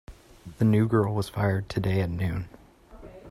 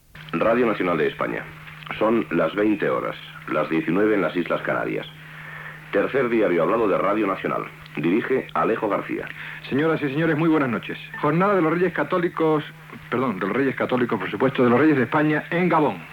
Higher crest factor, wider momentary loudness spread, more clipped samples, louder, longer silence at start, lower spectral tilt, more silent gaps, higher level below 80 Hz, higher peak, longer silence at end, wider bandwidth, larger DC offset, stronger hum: about the same, 16 dB vs 14 dB; about the same, 12 LU vs 13 LU; neither; second, -26 LUFS vs -22 LUFS; about the same, 0.1 s vs 0.15 s; about the same, -8 dB/octave vs -8 dB/octave; neither; first, -50 dBFS vs -58 dBFS; about the same, -10 dBFS vs -8 dBFS; about the same, 0 s vs 0 s; second, 13.5 kHz vs 18 kHz; neither; neither